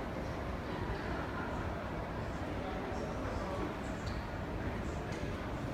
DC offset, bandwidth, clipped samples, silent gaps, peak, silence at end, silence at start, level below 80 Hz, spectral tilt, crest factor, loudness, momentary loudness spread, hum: under 0.1%; 16 kHz; under 0.1%; none; -26 dBFS; 0 s; 0 s; -46 dBFS; -6.5 dB/octave; 14 dB; -40 LUFS; 2 LU; none